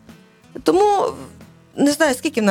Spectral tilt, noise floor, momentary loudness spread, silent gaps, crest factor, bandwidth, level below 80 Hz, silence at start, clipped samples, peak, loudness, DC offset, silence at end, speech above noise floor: -4 dB/octave; -46 dBFS; 20 LU; none; 18 dB; 16.5 kHz; -54 dBFS; 0.55 s; under 0.1%; -2 dBFS; -18 LUFS; under 0.1%; 0 s; 29 dB